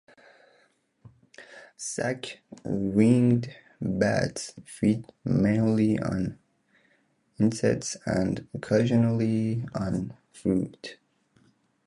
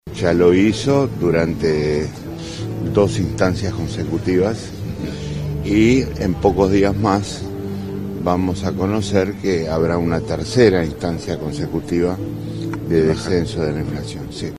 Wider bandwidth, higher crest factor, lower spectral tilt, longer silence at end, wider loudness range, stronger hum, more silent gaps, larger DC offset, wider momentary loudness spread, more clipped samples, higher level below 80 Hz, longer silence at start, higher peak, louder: second, 11.5 kHz vs 14.5 kHz; about the same, 20 dB vs 18 dB; about the same, -6.5 dB/octave vs -6.5 dB/octave; first, 0.95 s vs 0 s; about the same, 3 LU vs 3 LU; neither; neither; neither; first, 17 LU vs 12 LU; neither; second, -54 dBFS vs -36 dBFS; first, 1.05 s vs 0.05 s; second, -8 dBFS vs 0 dBFS; second, -27 LUFS vs -19 LUFS